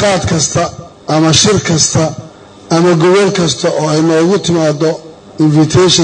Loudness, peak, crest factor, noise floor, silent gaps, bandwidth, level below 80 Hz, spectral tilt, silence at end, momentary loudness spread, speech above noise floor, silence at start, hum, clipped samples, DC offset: -10 LUFS; 0 dBFS; 10 dB; -31 dBFS; none; 9.6 kHz; -40 dBFS; -4.5 dB/octave; 0 s; 8 LU; 21 dB; 0 s; none; under 0.1%; under 0.1%